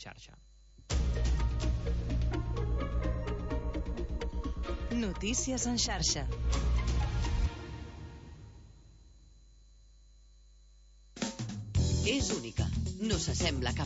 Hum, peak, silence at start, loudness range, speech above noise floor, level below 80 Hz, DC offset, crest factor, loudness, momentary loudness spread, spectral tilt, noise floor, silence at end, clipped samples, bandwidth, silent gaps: none; -16 dBFS; 0 s; 12 LU; 26 dB; -36 dBFS; under 0.1%; 18 dB; -34 LUFS; 15 LU; -4.5 dB/octave; -58 dBFS; 0 s; under 0.1%; 8 kHz; none